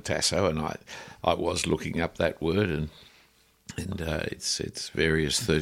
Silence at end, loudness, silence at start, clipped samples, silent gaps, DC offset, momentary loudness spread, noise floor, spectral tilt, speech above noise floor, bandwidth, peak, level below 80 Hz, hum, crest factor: 0 s; -28 LUFS; 0.05 s; under 0.1%; none; under 0.1%; 12 LU; -62 dBFS; -4 dB/octave; 34 dB; 16.5 kHz; -8 dBFS; -46 dBFS; none; 20 dB